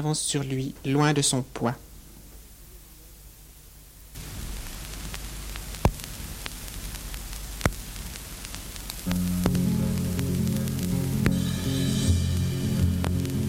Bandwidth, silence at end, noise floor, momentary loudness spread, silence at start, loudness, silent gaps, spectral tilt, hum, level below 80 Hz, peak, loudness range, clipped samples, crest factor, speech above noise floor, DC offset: 17 kHz; 0 s; -48 dBFS; 23 LU; 0 s; -28 LUFS; none; -5 dB/octave; none; -38 dBFS; -6 dBFS; 13 LU; under 0.1%; 22 dB; 22 dB; under 0.1%